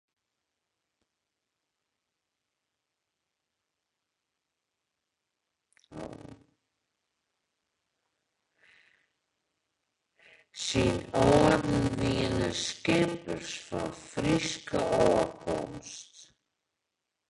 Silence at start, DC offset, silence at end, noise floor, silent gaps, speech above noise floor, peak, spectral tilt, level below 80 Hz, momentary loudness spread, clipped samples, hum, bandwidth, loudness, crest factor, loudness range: 5.9 s; under 0.1%; 1.05 s; -85 dBFS; none; 57 dB; -10 dBFS; -5 dB/octave; -52 dBFS; 20 LU; under 0.1%; none; 11.5 kHz; -28 LUFS; 24 dB; 5 LU